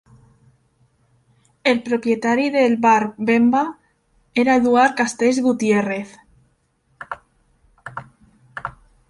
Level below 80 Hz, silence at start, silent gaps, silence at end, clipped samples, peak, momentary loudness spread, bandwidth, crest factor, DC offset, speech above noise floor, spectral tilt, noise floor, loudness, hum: -58 dBFS; 1.65 s; none; 0.4 s; under 0.1%; -4 dBFS; 20 LU; 11.5 kHz; 18 dB; under 0.1%; 47 dB; -5 dB/octave; -64 dBFS; -18 LUFS; none